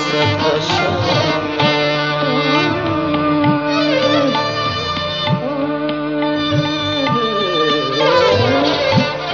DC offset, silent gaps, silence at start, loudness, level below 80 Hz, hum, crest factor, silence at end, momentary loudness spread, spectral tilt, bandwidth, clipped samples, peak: under 0.1%; none; 0 s; -16 LUFS; -46 dBFS; none; 14 dB; 0 s; 5 LU; -3.5 dB/octave; 7.4 kHz; under 0.1%; -2 dBFS